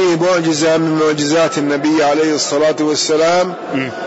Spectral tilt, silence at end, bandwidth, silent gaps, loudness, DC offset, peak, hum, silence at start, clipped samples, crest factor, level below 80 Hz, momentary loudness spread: -4 dB/octave; 0 s; 8 kHz; none; -14 LUFS; under 0.1%; -4 dBFS; none; 0 s; under 0.1%; 8 dB; -58 dBFS; 3 LU